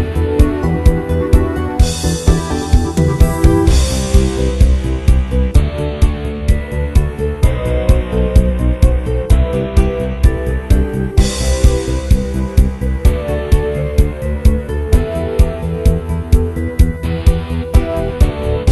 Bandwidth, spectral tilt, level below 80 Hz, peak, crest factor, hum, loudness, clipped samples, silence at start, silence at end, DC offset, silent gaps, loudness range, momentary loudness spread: 12.5 kHz; -6.5 dB/octave; -14 dBFS; 0 dBFS; 12 dB; none; -15 LUFS; 0.2%; 0 s; 0 s; under 0.1%; none; 2 LU; 4 LU